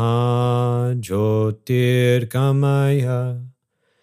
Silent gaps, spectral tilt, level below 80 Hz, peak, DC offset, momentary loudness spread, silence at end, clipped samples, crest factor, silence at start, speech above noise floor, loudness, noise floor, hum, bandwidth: none; -7.5 dB/octave; -60 dBFS; -6 dBFS; under 0.1%; 5 LU; 0.55 s; under 0.1%; 14 dB; 0 s; 49 dB; -19 LUFS; -67 dBFS; none; 15.5 kHz